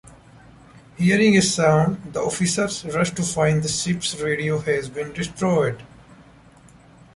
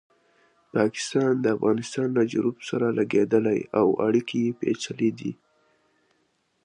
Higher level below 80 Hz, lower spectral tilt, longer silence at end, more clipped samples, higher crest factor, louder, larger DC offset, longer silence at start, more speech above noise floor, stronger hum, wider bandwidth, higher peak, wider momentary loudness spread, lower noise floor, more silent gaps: first, -52 dBFS vs -68 dBFS; second, -4.5 dB/octave vs -6 dB/octave; second, 1 s vs 1.3 s; neither; about the same, 18 dB vs 18 dB; first, -21 LUFS vs -25 LUFS; neither; about the same, 0.75 s vs 0.75 s; second, 29 dB vs 47 dB; neither; about the same, 11.5 kHz vs 10.5 kHz; first, -4 dBFS vs -8 dBFS; first, 10 LU vs 6 LU; second, -49 dBFS vs -70 dBFS; neither